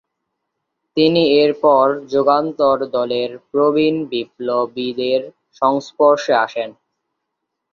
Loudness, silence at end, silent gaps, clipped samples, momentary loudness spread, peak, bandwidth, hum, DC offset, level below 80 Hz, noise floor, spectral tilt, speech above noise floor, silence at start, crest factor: -17 LUFS; 1 s; none; under 0.1%; 9 LU; -2 dBFS; 7.2 kHz; none; under 0.1%; -62 dBFS; -77 dBFS; -6 dB/octave; 61 dB; 0.95 s; 16 dB